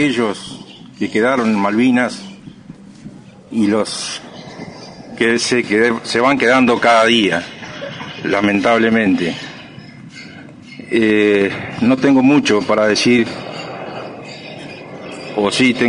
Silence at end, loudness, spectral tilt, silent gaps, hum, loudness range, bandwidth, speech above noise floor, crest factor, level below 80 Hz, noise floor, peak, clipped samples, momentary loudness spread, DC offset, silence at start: 0 s; -14 LUFS; -4.5 dB/octave; none; none; 5 LU; 10.5 kHz; 24 dB; 16 dB; -54 dBFS; -38 dBFS; 0 dBFS; under 0.1%; 22 LU; under 0.1%; 0 s